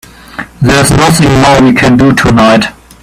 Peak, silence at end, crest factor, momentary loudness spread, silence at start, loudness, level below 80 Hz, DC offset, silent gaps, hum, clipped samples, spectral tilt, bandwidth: 0 dBFS; 0.3 s; 6 dB; 14 LU; 0.35 s; -6 LUFS; -26 dBFS; under 0.1%; none; none; 0.3%; -5 dB/octave; 16 kHz